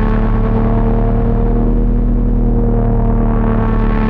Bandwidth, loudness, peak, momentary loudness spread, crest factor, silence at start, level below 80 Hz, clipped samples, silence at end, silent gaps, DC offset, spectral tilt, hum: 3.6 kHz; -15 LUFS; -4 dBFS; 1 LU; 8 dB; 0 s; -14 dBFS; under 0.1%; 0 s; none; under 0.1%; -11.5 dB/octave; none